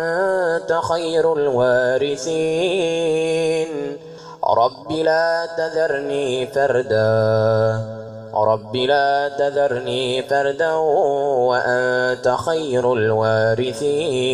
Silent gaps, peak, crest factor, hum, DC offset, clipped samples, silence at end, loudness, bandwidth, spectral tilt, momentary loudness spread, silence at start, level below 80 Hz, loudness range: none; -4 dBFS; 14 dB; none; under 0.1%; under 0.1%; 0 s; -19 LUFS; 11.5 kHz; -5 dB/octave; 5 LU; 0 s; -54 dBFS; 2 LU